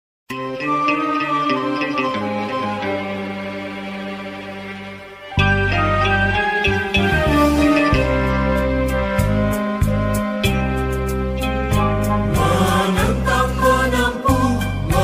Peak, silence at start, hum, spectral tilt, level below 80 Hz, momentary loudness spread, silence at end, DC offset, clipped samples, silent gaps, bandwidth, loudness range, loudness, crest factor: -2 dBFS; 0.3 s; none; -6 dB/octave; -28 dBFS; 12 LU; 0 s; under 0.1%; under 0.1%; none; 16 kHz; 7 LU; -18 LUFS; 16 dB